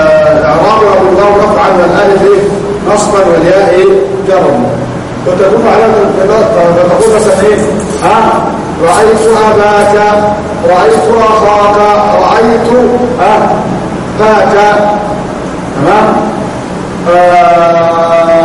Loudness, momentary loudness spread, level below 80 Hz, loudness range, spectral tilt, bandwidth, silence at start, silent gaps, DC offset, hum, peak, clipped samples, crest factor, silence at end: -7 LUFS; 7 LU; -32 dBFS; 2 LU; -5.5 dB/octave; 12 kHz; 0 s; none; under 0.1%; none; 0 dBFS; 2%; 6 dB; 0 s